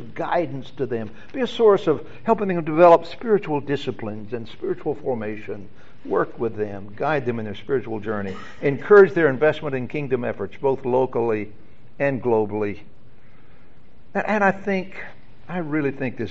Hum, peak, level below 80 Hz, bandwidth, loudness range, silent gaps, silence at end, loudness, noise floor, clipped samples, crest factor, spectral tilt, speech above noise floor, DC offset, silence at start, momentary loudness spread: none; -2 dBFS; -56 dBFS; 7.6 kHz; 7 LU; none; 0 s; -22 LUFS; -52 dBFS; under 0.1%; 20 dB; -5.5 dB/octave; 30 dB; 2%; 0 s; 16 LU